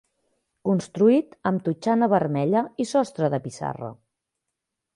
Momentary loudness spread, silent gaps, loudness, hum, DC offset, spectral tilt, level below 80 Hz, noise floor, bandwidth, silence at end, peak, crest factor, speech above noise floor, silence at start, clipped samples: 12 LU; none; -23 LUFS; none; under 0.1%; -7 dB/octave; -66 dBFS; -83 dBFS; 11 kHz; 1 s; -6 dBFS; 18 dB; 60 dB; 0.65 s; under 0.1%